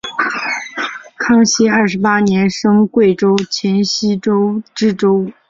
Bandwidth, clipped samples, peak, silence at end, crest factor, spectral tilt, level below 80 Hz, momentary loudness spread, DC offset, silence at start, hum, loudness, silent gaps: 7.6 kHz; under 0.1%; 0 dBFS; 0.2 s; 14 dB; -5 dB/octave; -54 dBFS; 9 LU; under 0.1%; 0.05 s; none; -14 LUFS; none